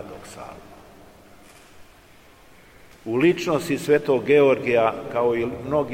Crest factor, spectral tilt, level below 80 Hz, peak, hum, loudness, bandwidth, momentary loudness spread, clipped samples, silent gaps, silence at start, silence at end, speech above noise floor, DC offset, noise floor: 18 dB; -6 dB/octave; -56 dBFS; -6 dBFS; none; -21 LUFS; 16.5 kHz; 22 LU; under 0.1%; none; 0 s; 0 s; 30 dB; 0.1%; -51 dBFS